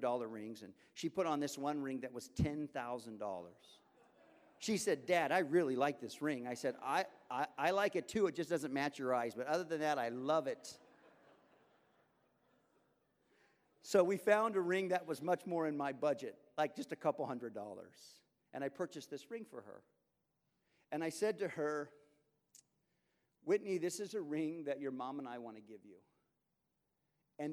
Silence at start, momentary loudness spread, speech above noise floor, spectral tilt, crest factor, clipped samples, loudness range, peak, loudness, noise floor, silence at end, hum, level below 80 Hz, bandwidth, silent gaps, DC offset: 0 s; 16 LU; 47 dB; -5 dB/octave; 22 dB; under 0.1%; 8 LU; -18 dBFS; -39 LUFS; -86 dBFS; 0 s; none; -70 dBFS; 19.5 kHz; none; under 0.1%